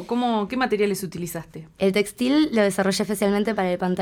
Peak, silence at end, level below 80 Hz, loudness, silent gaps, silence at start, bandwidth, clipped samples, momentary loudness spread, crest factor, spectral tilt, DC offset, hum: -6 dBFS; 0 s; -56 dBFS; -23 LUFS; none; 0 s; 18.5 kHz; under 0.1%; 11 LU; 16 dB; -5 dB/octave; under 0.1%; none